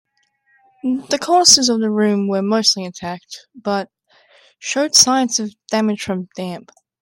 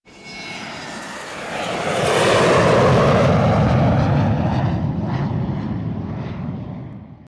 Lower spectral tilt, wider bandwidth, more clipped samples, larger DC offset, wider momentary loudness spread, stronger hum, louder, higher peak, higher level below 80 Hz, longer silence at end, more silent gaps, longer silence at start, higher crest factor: second, -2.5 dB/octave vs -6 dB/octave; first, 16.5 kHz vs 11 kHz; neither; neither; about the same, 18 LU vs 16 LU; neither; first, -15 LUFS vs -18 LUFS; first, 0 dBFS vs -4 dBFS; second, -62 dBFS vs -38 dBFS; first, 0.4 s vs 0.15 s; neither; first, 0.85 s vs 0.15 s; about the same, 18 dB vs 14 dB